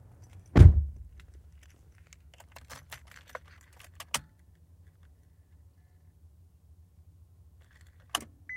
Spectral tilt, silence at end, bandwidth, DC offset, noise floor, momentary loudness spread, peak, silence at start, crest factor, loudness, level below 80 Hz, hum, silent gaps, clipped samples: -6 dB/octave; 0 s; 14 kHz; under 0.1%; -59 dBFS; 30 LU; -2 dBFS; 0.55 s; 28 dB; -24 LUFS; -34 dBFS; none; none; under 0.1%